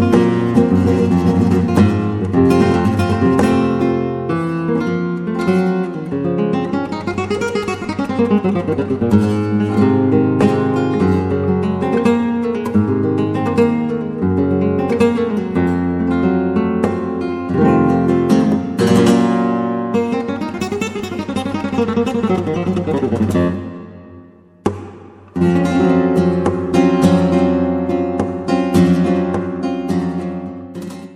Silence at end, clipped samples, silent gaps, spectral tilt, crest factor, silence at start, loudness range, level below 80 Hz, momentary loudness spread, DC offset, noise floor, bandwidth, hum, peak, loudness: 0 s; under 0.1%; none; -8 dB/octave; 14 dB; 0 s; 4 LU; -44 dBFS; 8 LU; under 0.1%; -42 dBFS; 13 kHz; none; 0 dBFS; -16 LUFS